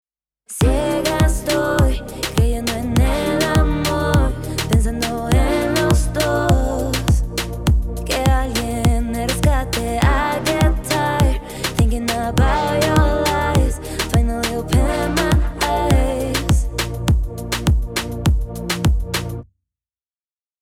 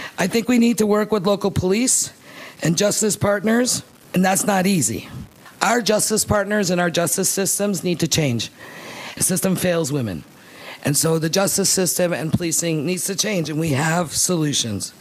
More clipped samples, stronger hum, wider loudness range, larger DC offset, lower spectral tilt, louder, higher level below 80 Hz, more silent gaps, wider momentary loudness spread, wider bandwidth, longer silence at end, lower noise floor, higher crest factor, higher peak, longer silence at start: neither; neither; about the same, 2 LU vs 2 LU; neither; first, -5.5 dB/octave vs -4 dB/octave; about the same, -19 LUFS vs -19 LUFS; first, -22 dBFS vs -50 dBFS; neither; second, 5 LU vs 10 LU; about the same, 16.5 kHz vs 15.5 kHz; first, 1.2 s vs 0.1 s; first, under -90 dBFS vs -39 dBFS; about the same, 16 dB vs 20 dB; about the same, -2 dBFS vs 0 dBFS; first, 0.5 s vs 0 s